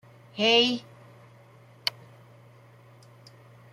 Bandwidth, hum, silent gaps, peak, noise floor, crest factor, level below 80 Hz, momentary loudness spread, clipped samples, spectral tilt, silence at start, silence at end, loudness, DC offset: 14.5 kHz; none; none; -8 dBFS; -54 dBFS; 24 dB; -78 dBFS; 15 LU; under 0.1%; -3 dB/octave; 0.35 s; 1.85 s; -24 LUFS; under 0.1%